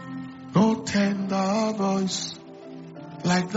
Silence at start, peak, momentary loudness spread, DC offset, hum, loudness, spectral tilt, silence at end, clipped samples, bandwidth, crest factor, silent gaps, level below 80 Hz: 0 s; -8 dBFS; 19 LU; under 0.1%; none; -25 LUFS; -5 dB/octave; 0 s; under 0.1%; 8 kHz; 16 dB; none; -62 dBFS